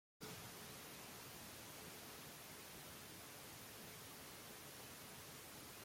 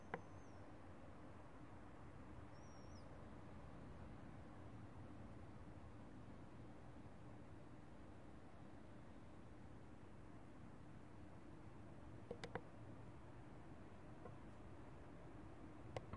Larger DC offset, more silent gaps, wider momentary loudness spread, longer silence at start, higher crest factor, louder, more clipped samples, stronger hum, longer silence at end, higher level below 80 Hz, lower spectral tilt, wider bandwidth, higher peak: neither; neither; second, 1 LU vs 6 LU; first, 0.2 s vs 0 s; second, 16 dB vs 28 dB; first, -54 LUFS vs -60 LUFS; neither; neither; about the same, 0 s vs 0 s; second, -78 dBFS vs -68 dBFS; second, -2.5 dB/octave vs -7 dB/octave; first, 16.5 kHz vs 10.5 kHz; second, -40 dBFS vs -30 dBFS